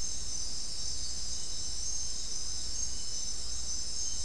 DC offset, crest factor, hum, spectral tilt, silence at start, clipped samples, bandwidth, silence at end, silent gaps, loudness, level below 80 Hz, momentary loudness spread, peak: 3%; 14 dB; none; -0.5 dB/octave; 0 s; under 0.1%; 12 kHz; 0 s; none; -35 LUFS; -46 dBFS; 2 LU; -20 dBFS